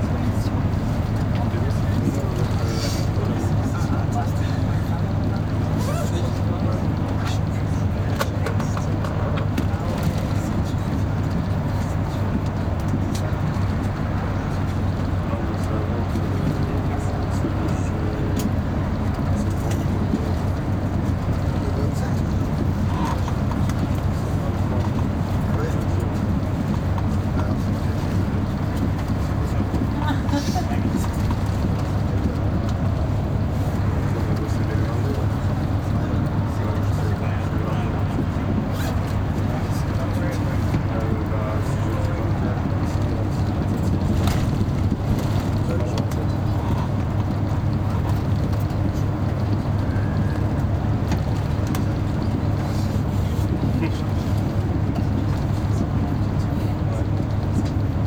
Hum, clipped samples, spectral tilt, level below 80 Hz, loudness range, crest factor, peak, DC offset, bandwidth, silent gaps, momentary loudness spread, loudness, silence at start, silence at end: none; under 0.1%; -7.5 dB/octave; -30 dBFS; 1 LU; 16 dB; -6 dBFS; under 0.1%; 16.5 kHz; none; 1 LU; -23 LUFS; 0 s; 0 s